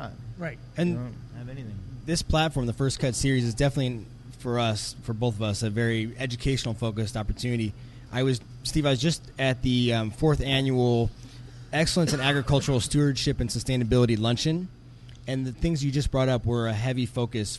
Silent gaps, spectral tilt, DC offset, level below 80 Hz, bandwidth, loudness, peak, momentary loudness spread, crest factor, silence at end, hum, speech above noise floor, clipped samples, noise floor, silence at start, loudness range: none; -5.5 dB/octave; under 0.1%; -40 dBFS; 12 kHz; -26 LUFS; -8 dBFS; 14 LU; 18 dB; 0 s; none; 20 dB; under 0.1%; -46 dBFS; 0 s; 4 LU